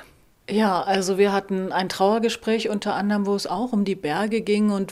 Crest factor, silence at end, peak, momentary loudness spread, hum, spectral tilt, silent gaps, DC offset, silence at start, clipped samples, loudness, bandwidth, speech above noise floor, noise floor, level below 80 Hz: 16 dB; 0 s; -6 dBFS; 4 LU; none; -5.5 dB/octave; none; under 0.1%; 0 s; under 0.1%; -23 LUFS; 14 kHz; 24 dB; -46 dBFS; -60 dBFS